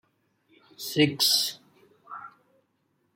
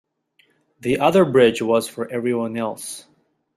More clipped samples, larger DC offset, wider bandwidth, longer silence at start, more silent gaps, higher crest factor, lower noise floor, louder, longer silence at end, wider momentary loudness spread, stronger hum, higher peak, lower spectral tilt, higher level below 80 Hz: neither; neither; about the same, 16.5 kHz vs 15 kHz; about the same, 0.8 s vs 0.85 s; neither; about the same, 22 dB vs 18 dB; first, -73 dBFS vs -62 dBFS; second, -23 LUFS vs -19 LUFS; first, 0.9 s vs 0.55 s; first, 22 LU vs 16 LU; neither; second, -8 dBFS vs -2 dBFS; second, -3 dB/octave vs -5.5 dB/octave; second, -74 dBFS vs -58 dBFS